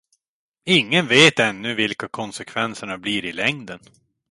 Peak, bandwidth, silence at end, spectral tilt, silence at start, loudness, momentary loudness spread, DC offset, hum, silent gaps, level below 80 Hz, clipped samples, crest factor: 0 dBFS; 11.5 kHz; 0.55 s; -3.5 dB/octave; 0.65 s; -19 LUFS; 19 LU; under 0.1%; none; none; -60 dBFS; under 0.1%; 22 dB